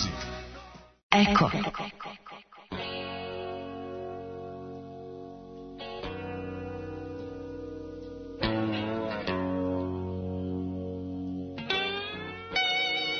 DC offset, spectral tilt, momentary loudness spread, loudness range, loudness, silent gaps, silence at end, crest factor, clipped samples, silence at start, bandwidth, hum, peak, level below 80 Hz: under 0.1%; -5 dB/octave; 17 LU; 11 LU; -32 LUFS; 1.03-1.10 s; 0 s; 26 dB; under 0.1%; 0 s; 6.6 kHz; none; -6 dBFS; -52 dBFS